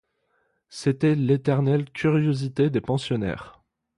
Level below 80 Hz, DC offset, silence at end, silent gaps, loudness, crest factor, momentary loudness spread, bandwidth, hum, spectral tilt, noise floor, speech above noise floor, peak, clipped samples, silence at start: -54 dBFS; under 0.1%; 0.5 s; none; -24 LUFS; 16 dB; 7 LU; 11.5 kHz; none; -7.5 dB/octave; -70 dBFS; 48 dB; -8 dBFS; under 0.1%; 0.7 s